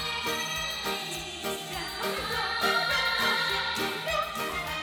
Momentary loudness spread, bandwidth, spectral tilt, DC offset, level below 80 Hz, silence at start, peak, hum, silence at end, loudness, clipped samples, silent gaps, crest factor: 9 LU; 20 kHz; -2 dB/octave; under 0.1%; -52 dBFS; 0 s; -12 dBFS; none; 0 s; -28 LUFS; under 0.1%; none; 18 dB